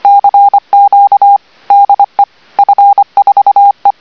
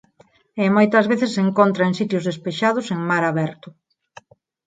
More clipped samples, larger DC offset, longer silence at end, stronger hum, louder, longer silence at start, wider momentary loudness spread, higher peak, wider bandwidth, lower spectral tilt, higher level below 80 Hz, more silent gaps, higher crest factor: first, 3% vs under 0.1%; first, 0.3% vs under 0.1%; second, 0.1 s vs 0.95 s; neither; first, -7 LUFS vs -19 LUFS; second, 0.05 s vs 0.55 s; second, 5 LU vs 9 LU; about the same, 0 dBFS vs -2 dBFS; second, 5.4 kHz vs 9.2 kHz; second, -4 dB/octave vs -6.5 dB/octave; first, -62 dBFS vs -68 dBFS; neither; second, 6 dB vs 20 dB